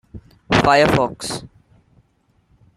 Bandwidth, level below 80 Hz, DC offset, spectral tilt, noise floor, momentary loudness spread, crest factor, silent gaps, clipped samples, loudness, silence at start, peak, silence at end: 15.5 kHz; -42 dBFS; under 0.1%; -5 dB/octave; -62 dBFS; 14 LU; 20 dB; none; under 0.1%; -17 LUFS; 0.15 s; -2 dBFS; 1.3 s